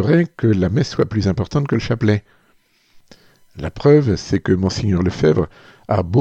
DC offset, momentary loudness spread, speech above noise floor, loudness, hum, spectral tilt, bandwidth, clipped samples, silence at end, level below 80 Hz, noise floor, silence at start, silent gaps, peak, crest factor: under 0.1%; 7 LU; 41 dB; -18 LUFS; none; -7.5 dB/octave; 8.2 kHz; under 0.1%; 0 s; -42 dBFS; -58 dBFS; 0 s; none; 0 dBFS; 16 dB